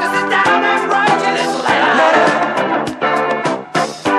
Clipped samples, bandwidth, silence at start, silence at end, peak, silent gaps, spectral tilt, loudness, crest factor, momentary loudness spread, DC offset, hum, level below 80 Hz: under 0.1%; 13 kHz; 0 s; 0 s; -2 dBFS; none; -4 dB/octave; -14 LUFS; 14 dB; 7 LU; under 0.1%; none; -58 dBFS